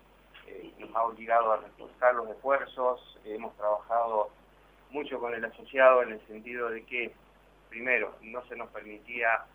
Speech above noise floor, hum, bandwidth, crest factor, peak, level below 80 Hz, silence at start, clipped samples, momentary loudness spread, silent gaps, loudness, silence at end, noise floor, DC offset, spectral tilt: 29 dB; 50 Hz at -65 dBFS; 19.5 kHz; 22 dB; -8 dBFS; -66 dBFS; 0.35 s; under 0.1%; 16 LU; none; -29 LUFS; 0.1 s; -59 dBFS; under 0.1%; -5.5 dB/octave